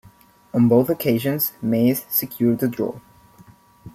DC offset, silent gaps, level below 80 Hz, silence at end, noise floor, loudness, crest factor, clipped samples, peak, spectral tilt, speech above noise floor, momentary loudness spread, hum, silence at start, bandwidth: under 0.1%; none; -58 dBFS; 0.05 s; -51 dBFS; -20 LUFS; 18 dB; under 0.1%; -4 dBFS; -6.5 dB/octave; 32 dB; 10 LU; none; 0.55 s; 15.5 kHz